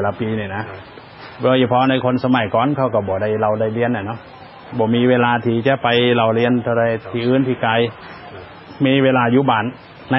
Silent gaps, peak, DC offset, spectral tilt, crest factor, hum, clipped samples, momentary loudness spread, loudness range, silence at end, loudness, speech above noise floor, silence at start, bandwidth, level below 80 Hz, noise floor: none; -2 dBFS; under 0.1%; -10.5 dB/octave; 16 dB; none; under 0.1%; 19 LU; 2 LU; 0 s; -17 LUFS; 19 dB; 0 s; 5.8 kHz; -50 dBFS; -36 dBFS